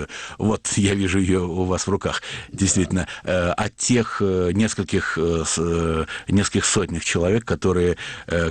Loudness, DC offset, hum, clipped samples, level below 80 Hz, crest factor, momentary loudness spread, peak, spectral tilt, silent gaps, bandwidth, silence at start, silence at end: -21 LUFS; under 0.1%; none; under 0.1%; -40 dBFS; 14 dB; 5 LU; -8 dBFS; -4.5 dB/octave; none; 10 kHz; 0 s; 0 s